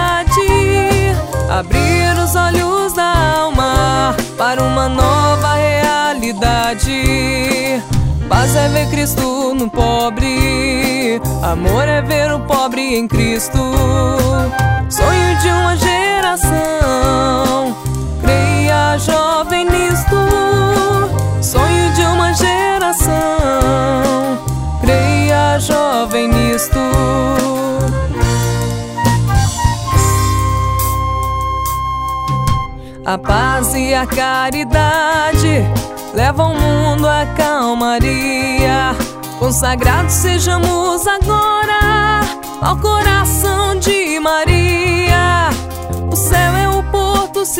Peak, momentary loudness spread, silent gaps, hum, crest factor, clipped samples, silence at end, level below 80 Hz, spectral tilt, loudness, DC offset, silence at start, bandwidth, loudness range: 0 dBFS; 5 LU; none; none; 14 dB; under 0.1%; 0 s; -22 dBFS; -4.5 dB/octave; -14 LUFS; under 0.1%; 0 s; 16.5 kHz; 2 LU